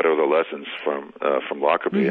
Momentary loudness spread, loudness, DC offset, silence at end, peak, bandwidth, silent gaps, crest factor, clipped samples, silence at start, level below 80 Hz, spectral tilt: 8 LU; -23 LUFS; under 0.1%; 0 s; -4 dBFS; 4.6 kHz; none; 18 dB; under 0.1%; 0 s; -74 dBFS; -8.5 dB/octave